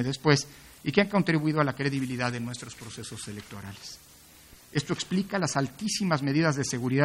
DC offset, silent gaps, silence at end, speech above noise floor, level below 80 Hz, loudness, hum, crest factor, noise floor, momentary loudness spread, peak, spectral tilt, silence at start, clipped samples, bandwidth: under 0.1%; none; 0 s; 25 dB; -62 dBFS; -28 LUFS; none; 22 dB; -53 dBFS; 16 LU; -6 dBFS; -5 dB/octave; 0 s; under 0.1%; 16 kHz